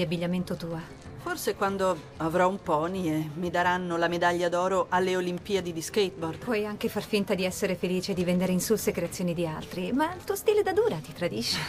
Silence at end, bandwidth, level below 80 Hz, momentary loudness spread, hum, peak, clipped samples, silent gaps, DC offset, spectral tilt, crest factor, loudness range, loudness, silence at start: 0 s; 15.5 kHz; -56 dBFS; 7 LU; none; -12 dBFS; under 0.1%; none; under 0.1%; -5 dB/octave; 16 dB; 2 LU; -28 LUFS; 0 s